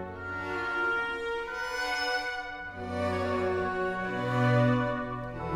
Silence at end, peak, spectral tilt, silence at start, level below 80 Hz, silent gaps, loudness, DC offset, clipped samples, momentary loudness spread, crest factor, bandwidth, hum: 0 s; -12 dBFS; -6 dB/octave; 0 s; -54 dBFS; none; -30 LUFS; under 0.1%; under 0.1%; 11 LU; 18 dB; 13.5 kHz; none